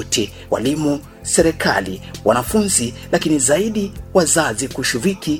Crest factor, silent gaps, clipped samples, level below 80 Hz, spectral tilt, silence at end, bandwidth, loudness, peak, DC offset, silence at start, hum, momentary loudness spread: 18 dB; none; under 0.1%; -40 dBFS; -3.5 dB/octave; 0 s; 18 kHz; -17 LUFS; 0 dBFS; under 0.1%; 0 s; none; 7 LU